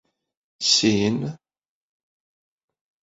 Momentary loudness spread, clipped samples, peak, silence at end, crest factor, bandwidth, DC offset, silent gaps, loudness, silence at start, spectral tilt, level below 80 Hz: 12 LU; under 0.1%; -6 dBFS; 1.7 s; 22 dB; 8 kHz; under 0.1%; none; -20 LUFS; 0.6 s; -3.5 dB/octave; -60 dBFS